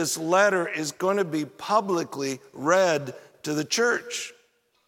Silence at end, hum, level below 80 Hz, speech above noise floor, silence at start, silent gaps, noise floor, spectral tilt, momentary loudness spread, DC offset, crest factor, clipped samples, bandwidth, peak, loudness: 0.55 s; none; -78 dBFS; 41 dB; 0 s; none; -66 dBFS; -3.5 dB/octave; 12 LU; under 0.1%; 20 dB; under 0.1%; 16.5 kHz; -6 dBFS; -25 LUFS